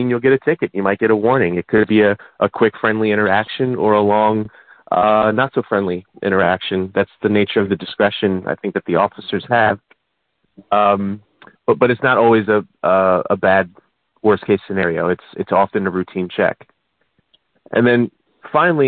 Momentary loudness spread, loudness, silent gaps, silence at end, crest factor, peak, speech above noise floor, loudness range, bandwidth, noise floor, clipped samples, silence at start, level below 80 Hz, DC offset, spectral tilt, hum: 8 LU; -17 LUFS; none; 0 s; 16 dB; -2 dBFS; 55 dB; 4 LU; 4.5 kHz; -71 dBFS; under 0.1%; 0 s; -56 dBFS; under 0.1%; -11.5 dB/octave; none